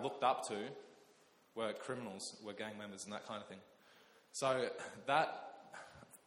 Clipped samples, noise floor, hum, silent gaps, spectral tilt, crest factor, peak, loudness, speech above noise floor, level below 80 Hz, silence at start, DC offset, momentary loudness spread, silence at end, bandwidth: under 0.1%; -69 dBFS; none; none; -3.5 dB/octave; 22 dB; -20 dBFS; -41 LUFS; 28 dB; -84 dBFS; 0 s; under 0.1%; 19 LU; 0.1 s; 17 kHz